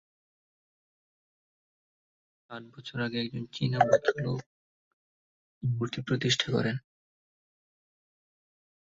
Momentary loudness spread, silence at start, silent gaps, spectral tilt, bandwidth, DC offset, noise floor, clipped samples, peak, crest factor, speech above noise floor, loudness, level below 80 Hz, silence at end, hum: 17 LU; 2.5 s; 4.46-5.61 s; -5 dB/octave; 7.8 kHz; under 0.1%; under -90 dBFS; under 0.1%; -8 dBFS; 26 dB; over 61 dB; -30 LUFS; -66 dBFS; 2.2 s; none